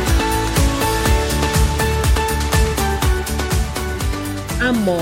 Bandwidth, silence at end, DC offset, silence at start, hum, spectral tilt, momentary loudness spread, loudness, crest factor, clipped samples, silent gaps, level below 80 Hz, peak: 16.5 kHz; 0 s; under 0.1%; 0 s; none; -4.5 dB/octave; 6 LU; -18 LUFS; 14 dB; under 0.1%; none; -22 dBFS; -4 dBFS